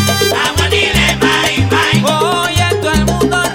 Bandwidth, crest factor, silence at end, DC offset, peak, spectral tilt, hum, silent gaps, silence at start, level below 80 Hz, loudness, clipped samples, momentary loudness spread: 17 kHz; 12 dB; 0 s; under 0.1%; 0 dBFS; -4 dB/octave; none; none; 0 s; -26 dBFS; -12 LUFS; under 0.1%; 2 LU